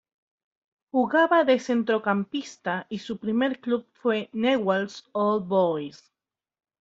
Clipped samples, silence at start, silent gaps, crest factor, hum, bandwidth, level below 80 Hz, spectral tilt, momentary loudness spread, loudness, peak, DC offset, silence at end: under 0.1%; 0.95 s; none; 18 dB; none; 7.8 kHz; -70 dBFS; -6 dB/octave; 11 LU; -25 LUFS; -8 dBFS; under 0.1%; 0.85 s